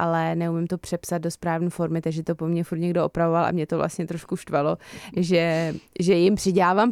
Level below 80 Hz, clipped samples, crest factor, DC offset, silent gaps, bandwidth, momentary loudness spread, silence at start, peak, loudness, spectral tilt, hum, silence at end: -54 dBFS; under 0.1%; 14 dB; under 0.1%; none; 14 kHz; 9 LU; 0 s; -8 dBFS; -24 LUFS; -6.5 dB/octave; none; 0 s